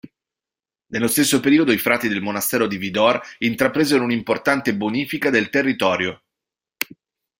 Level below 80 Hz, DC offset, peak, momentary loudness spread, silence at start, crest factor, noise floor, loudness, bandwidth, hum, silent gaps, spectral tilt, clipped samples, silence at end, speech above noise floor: -60 dBFS; under 0.1%; -2 dBFS; 8 LU; 0.05 s; 18 dB; under -90 dBFS; -19 LUFS; 16.5 kHz; none; none; -4 dB/octave; under 0.1%; 0.55 s; over 71 dB